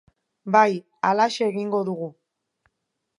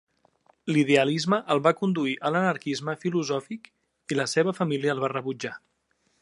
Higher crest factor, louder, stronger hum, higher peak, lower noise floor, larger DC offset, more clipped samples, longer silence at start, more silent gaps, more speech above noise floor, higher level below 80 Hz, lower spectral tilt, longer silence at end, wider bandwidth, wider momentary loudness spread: about the same, 22 dB vs 20 dB; first, -22 LUFS vs -26 LUFS; neither; about the same, -4 dBFS vs -6 dBFS; first, -79 dBFS vs -71 dBFS; neither; neither; second, 0.45 s vs 0.65 s; neither; first, 57 dB vs 46 dB; about the same, -78 dBFS vs -74 dBFS; about the same, -5.5 dB/octave vs -5.5 dB/octave; first, 1.1 s vs 0.65 s; about the same, 11 kHz vs 11.5 kHz; about the same, 14 LU vs 14 LU